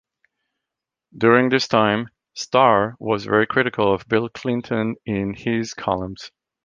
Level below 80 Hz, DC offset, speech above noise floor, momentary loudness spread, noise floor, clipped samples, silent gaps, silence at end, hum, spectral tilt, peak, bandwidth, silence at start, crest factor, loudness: -52 dBFS; under 0.1%; 65 dB; 10 LU; -85 dBFS; under 0.1%; none; 0.35 s; none; -5.5 dB/octave; -2 dBFS; 7.6 kHz; 1.15 s; 20 dB; -20 LUFS